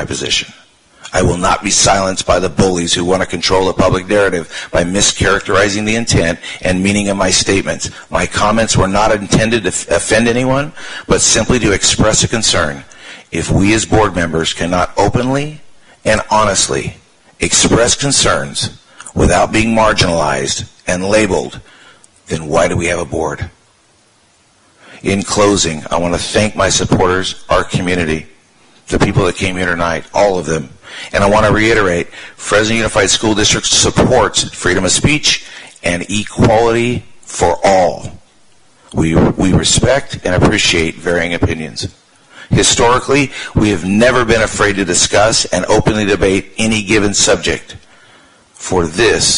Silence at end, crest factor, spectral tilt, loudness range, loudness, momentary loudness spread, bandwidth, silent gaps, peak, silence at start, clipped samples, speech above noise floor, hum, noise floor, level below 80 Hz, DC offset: 0 s; 14 dB; -3.5 dB/octave; 4 LU; -13 LUFS; 10 LU; 11 kHz; none; 0 dBFS; 0 s; under 0.1%; 39 dB; none; -51 dBFS; -30 dBFS; under 0.1%